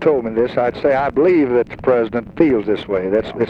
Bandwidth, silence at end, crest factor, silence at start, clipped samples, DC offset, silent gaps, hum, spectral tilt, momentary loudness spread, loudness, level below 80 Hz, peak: 5.8 kHz; 0 s; 16 dB; 0 s; under 0.1%; under 0.1%; none; none; -8.5 dB/octave; 5 LU; -17 LUFS; -44 dBFS; 0 dBFS